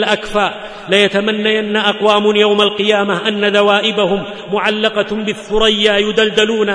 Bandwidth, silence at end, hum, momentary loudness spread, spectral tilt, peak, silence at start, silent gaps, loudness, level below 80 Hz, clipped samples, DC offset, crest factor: 10.5 kHz; 0 s; none; 7 LU; -4 dB/octave; 0 dBFS; 0 s; none; -13 LUFS; -40 dBFS; under 0.1%; under 0.1%; 14 dB